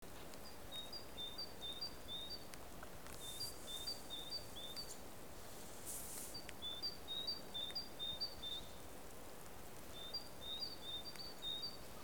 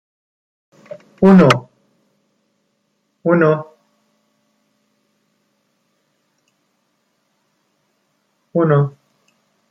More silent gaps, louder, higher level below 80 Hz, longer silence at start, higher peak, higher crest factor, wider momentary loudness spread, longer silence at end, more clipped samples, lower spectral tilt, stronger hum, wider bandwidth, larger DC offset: neither; second, -47 LUFS vs -14 LUFS; second, -66 dBFS vs -56 dBFS; second, 0 s vs 1.2 s; second, -28 dBFS vs 0 dBFS; about the same, 22 dB vs 20 dB; second, 11 LU vs 29 LU; second, 0 s vs 0.8 s; neither; second, -2 dB/octave vs -7.5 dB/octave; neither; first, over 20 kHz vs 9 kHz; first, 0.2% vs under 0.1%